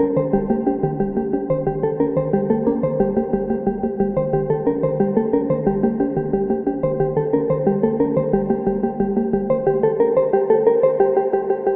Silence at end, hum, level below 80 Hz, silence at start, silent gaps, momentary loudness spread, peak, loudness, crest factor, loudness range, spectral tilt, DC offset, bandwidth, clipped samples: 0 s; none; -42 dBFS; 0 s; none; 5 LU; -2 dBFS; -19 LUFS; 16 dB; 2 LU; -13.5 dB/octave; under 0.1%; 3.3 kHz; under 0.1%